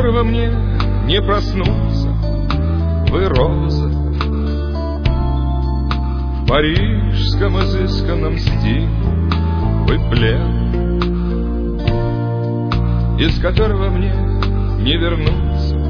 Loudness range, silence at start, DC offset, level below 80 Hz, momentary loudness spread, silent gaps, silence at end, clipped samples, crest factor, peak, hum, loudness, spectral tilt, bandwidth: 1 LU; 0 s; under 0.1%; -18 dBFS; 4 LU; none; 0 s; under 0.1%; 14 dB; -2 dBFS; none; -17 LUFS; -8 dB/octave; 5.4 kHz